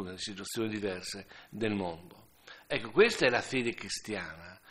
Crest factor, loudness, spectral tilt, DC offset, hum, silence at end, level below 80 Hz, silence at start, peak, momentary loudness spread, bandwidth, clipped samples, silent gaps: 24 dB; -32 LUFS; -4 dB/octave; under 0.1%; none; 0.15 s; -64 dBFS; 0 s; -10 dBFS; 18 LU; 15 kHz; under 0.1%; none